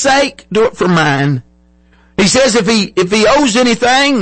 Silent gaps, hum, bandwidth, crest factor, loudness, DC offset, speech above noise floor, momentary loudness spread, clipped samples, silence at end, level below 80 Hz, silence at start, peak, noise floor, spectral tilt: none; none; 8.8 kHz; 10 dB; -11 LUFS; under 0.1%; 37 dB; 6 LU; under 0.1%; 0 s; -40 dBFS; 0 s; -2 dBFS; -48 dBFS; -4 dB/octave